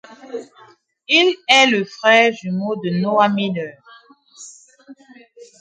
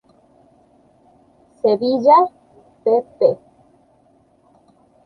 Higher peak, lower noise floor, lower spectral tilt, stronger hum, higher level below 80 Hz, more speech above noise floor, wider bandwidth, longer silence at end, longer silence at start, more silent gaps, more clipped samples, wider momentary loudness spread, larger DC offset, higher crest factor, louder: about the same, 0 dBFS vs -2 dBFS; second, -50 dBFS vs -56 dBFS; second, -4 dB/octave vs -7.5 dB/octave; neither; about the same, -70 dBFS vs -66 dBFS; second, 34 dB vs 41 dB; first, 10.5 kHz vs 6.2 kHz; second, 0.15 s vs 1.7 s; second, 0.25 s vs 1.65 s; neither; neither; first, 21 LU vs 11 LU; neither; about the same, 20 dB vs 18 dB; about the same, -16 LUFS vs -17 LUFS